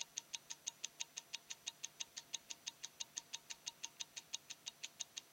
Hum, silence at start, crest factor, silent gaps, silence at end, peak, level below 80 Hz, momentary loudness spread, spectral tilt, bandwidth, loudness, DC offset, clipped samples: none; 0 s; 30 dB; none; 0 s; -22 dBFS; under -90 dBFS; 3 LU; 2 dB/octave; 16.5 kHz; -48 LUFS; under 0.1%; under 0.1%